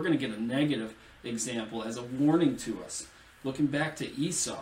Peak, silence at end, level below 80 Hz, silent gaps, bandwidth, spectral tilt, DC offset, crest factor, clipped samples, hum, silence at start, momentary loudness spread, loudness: -14 dBFS; 0 s; -62 dBFS; none; 16 kHz; -4.5 dB/octave; under 0.1%; 16 dB; under 0.1%; none; 0 s; 12 LU; -31 LUFS